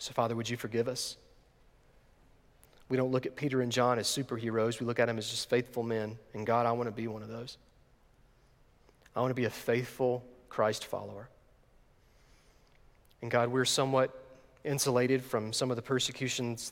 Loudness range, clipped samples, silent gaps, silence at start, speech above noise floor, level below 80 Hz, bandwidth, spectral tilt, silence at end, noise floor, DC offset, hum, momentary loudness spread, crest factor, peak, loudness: 6 LU; under 0.1%; none; 0 s; 32 dB; -66 dBFS; 17 kHz; -4.5 dB/octave; 0 s; -64 dBFS; under 0.1%; none; 12 LU; 20 dB; -14 dBFS; -32 LUFS